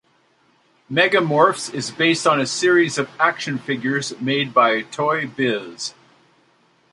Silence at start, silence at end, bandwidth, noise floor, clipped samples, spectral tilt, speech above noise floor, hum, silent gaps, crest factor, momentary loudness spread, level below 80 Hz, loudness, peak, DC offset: 0.9 s; 1.05 s; 11.5 kHz; -60 dBFS; under 0.1%; -4 dB/octave; 41 dB; none; none; 20 dB; 10 LU; -68 dBFS; -19 LUFS; 0 dBFS; under 0.1%